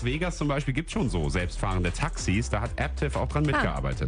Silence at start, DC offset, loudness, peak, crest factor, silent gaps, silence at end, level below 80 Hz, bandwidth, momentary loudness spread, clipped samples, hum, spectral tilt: 0 s; under 0.1%; -28 LUFS; -10 dBFS; 16 dB; none; 0 s; -34 dBFS; 10.5 kHz; 4 LU; under 0.1%; none; -5.5 dB/octave